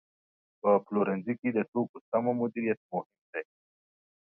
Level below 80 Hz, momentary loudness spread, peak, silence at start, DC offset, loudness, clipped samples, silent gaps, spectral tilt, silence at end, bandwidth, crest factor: -78 dBFS; 13 LU; -12 dBFS; 0.65 s; under 0.1%; -31 LUFS; under 0.1%; 1.68-1.73 s, 1.89-1.94 s, 2.01-2.12 s, 2.77-2.89 s, 3.06-3.10 s, 3.18-3.33 s; -11.5 dB/octave; 0.8 s; 3 kHz; 20 dB